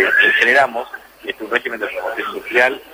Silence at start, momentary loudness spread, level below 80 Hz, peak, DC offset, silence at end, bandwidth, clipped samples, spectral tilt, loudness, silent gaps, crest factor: 0 s; 17 LU; -58 dBFS; 0 dBFS; under 0.1%; 0 s; 16.5 kHz; under 0.1%; -2.5 dB/octave; -15 LUFS; none; 18 dB